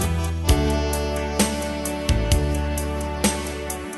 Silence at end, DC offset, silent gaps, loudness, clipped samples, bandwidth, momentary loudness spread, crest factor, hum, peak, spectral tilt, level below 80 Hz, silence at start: 0 s; under 0.1%; none; -23 LUFS; under 0.1%; 12.5 kHz; 6 LU; 18 dB; none; -4 dBFS; -4.5 dB/octave; -26 dBFS; 0 s